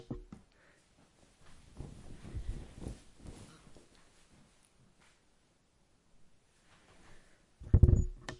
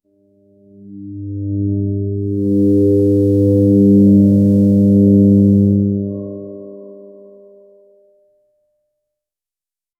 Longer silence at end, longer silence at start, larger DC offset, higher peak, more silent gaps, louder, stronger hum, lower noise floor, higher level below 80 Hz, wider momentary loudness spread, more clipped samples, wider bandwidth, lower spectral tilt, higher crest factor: second, 0.05 s vs 3 s; second, 0.1 s vs 0.85 s; neither; second, -10 dBFS vs -2 dBFS; neither; second, -33 LUFS vs -13 LUFS; neither; second, -71 dBFS vs under -90 dBFS; first, -42 dBFS vs -52 dBFS; first, 29 LU vs 20 LU; neither; first, 11 kHz vs 1.1 kHz; second, -8 dB/octave vs -12.5 dB/octave; first, 28 dB vs 14 dB